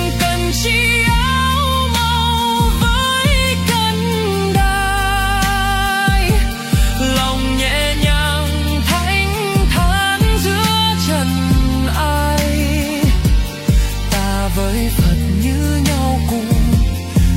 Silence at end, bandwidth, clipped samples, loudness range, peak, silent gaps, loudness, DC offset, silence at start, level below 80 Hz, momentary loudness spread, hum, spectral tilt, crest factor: 0 s; 16.5 kHz; under 0.1%; 2 LU; -2 dBFS; none; -15 LUFS; under 0.1%; 0 s; -20 dBFS; 3 LU; none; -4.5 dB/octave; 12 dB